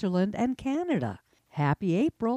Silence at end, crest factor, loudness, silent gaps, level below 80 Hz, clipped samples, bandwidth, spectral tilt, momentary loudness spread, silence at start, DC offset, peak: 0 s; 14 dB; -29 LUFS; none; -58 dBFS; under 0.1%; 11 kHz; -8 dB/octave; 10 LU; 0 s; under 0.1%; -14 dBFS